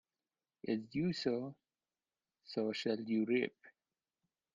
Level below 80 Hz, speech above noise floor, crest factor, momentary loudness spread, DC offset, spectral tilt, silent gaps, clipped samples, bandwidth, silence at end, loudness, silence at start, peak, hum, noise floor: -78 dBFS; over 53 dB; 18 dB; 9 LU; under 0.1%; -6.5 dB/octave; none; under 0.1%; 7.6 kHz; 0.85 s; -38 LUFS; 0.65 s; -22 dBFS; none; under -90 dBFS